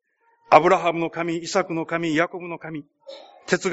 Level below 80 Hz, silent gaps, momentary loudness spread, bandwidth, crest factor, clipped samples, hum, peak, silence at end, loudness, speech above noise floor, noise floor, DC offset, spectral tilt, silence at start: -66 dBFS; none; 21 LU; 8 kHz; 22 dB; under 0.1%; none; 0 dBFS; 0 s; -21 LUFS; 37 dB; -59 dBFS; under 0.1%; -3.5 dB/octave; 0.5 s